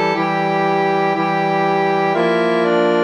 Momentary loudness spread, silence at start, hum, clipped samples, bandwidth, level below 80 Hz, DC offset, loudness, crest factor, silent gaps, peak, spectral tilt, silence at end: 2 LU; 0 s; none; under 0.1%; 10 kHz; -64 dBFS; under 0.1%; -16 LUFS; 12 dB; none; -4 dBFS; -6.5 dB/octave; 0 s